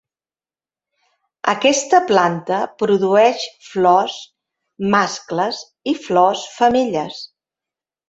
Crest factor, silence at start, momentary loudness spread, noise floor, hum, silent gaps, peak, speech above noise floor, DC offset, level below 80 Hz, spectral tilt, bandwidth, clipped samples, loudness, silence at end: 18 dB; 1.45 s; 12 LU; under -90 dBFS; none; none; -2 dBFS; over 73 dB; under 0.1%; -60 dBFS; -4 dB/octave; 8 kHz; under 0.1%; -17 LUFS; 0.85 s